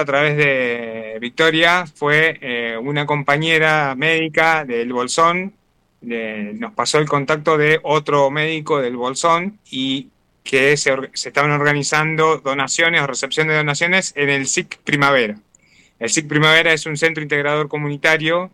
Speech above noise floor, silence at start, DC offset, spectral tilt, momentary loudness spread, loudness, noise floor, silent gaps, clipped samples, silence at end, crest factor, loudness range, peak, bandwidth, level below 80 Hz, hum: 36 dB; 0 s; under 0.1%; -3.5 dB/octave; 10 LU; -17 LUFS; -53 dBFS; none; under 0.1%; 0.05 s; 16 dB; 2 LU; -2 dBFS; 15 kHz; -60 dBFS; none